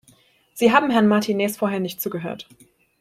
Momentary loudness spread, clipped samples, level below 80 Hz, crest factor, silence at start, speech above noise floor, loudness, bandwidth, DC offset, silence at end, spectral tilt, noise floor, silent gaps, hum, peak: 16 LU; under 0.1%; -64 dBFS; 20 dB; 0.55 s; 37 dB; -20 LUFS; 16 kHz; under 0.1%; 0.6 s; -5.5 dB/octave; -57 dBFS; none; none; -2 dBFS